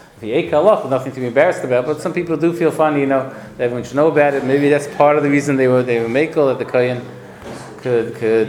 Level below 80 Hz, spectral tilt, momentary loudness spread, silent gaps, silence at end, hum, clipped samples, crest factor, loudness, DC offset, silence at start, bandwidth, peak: -56 dBFS; -6.5 dB/octave; 9 LU; none; 0 s; none; under 0.1%; 16 dB; -16 LUFS; under 0.1%; 0.2 s; 15 kHz; 0 dBFS